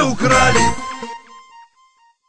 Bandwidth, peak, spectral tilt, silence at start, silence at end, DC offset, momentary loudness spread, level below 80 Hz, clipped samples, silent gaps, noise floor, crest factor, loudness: 11 kHz; -2 dBFS; -3.5 dB/octave; 0 s; 0 s; under 0.1%; 20 LU; -36 dBFS; under 0.1%; none; -55 dBFS; 16 dB; -14 LUFS